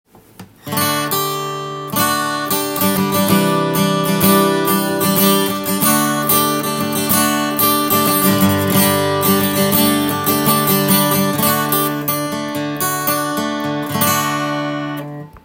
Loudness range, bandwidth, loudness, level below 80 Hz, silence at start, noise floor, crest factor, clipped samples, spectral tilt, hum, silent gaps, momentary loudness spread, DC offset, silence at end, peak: 4 LU; 17 kHz; -15 LUFS; -54 dBFS; 0.4 s; -41 dBFS; 16 dB; under 0.1%; -4 dB/octave; none; none; 8 LU; under 0.1%; 0.05 s; 0 dBFS